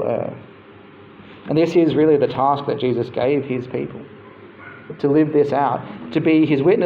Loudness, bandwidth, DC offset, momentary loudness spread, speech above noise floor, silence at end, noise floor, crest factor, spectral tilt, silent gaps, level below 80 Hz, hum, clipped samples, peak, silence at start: -19 LUFS; 7 kHz; under 0.1%; 21 LU; 26 dB; 0 s; -43 dBFS; 14 dB; -8.5 dB/octave; none; -60 dBFS; none; under 0.1%; -4 dBFS; 0 s